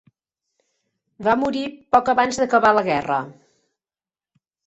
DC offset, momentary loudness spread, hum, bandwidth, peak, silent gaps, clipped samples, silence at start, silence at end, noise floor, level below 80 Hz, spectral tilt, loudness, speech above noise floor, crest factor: under 0.1%; 9 LU; none; 8.2 kHz; -2 dBFS; none; under 0.1%; 1.2 s; 1.35 s; under -90 dBFS; -58 dBFS; -4.5 dB/octave; -19 LUFS; over 71 dB; 20 dB